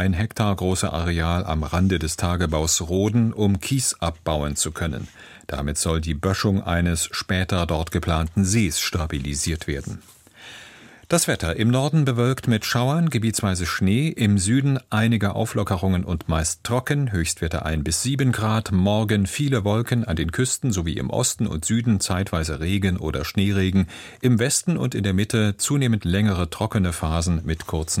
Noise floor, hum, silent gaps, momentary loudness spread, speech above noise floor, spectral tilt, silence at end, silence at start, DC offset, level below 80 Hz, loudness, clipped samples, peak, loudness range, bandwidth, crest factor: -46 dBFS; none; none; 5 LU; 24 dB; -5 dB/octave; 0 s; 0 s; under 0.1%; -36 dBFS; -22 LUFS; under 0.1%; -4 dBFS; 3 LU; 16.5 kHz; 16 dB